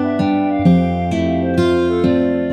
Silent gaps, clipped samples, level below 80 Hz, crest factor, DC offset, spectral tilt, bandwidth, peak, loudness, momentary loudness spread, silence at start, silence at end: none; under 0.1%; -40 dBFS; 12 dB; under 0.1%; -8 dB/octave; 9.4 kHz; -2 dBFS; -16 LUFS; 4 LU; 0 s; 0 s